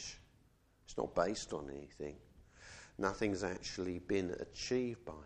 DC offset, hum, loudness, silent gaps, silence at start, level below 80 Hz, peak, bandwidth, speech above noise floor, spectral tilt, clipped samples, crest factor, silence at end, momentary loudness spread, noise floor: under 0.1%; none; -40 LUFS; none; 0 s; -62 dBFS; -18 dBFS; 10 kHz; 30 dB; -4.5 dB/octave; under 0.1%; 24 dB; 0 s; 18 LU; -70 dBFS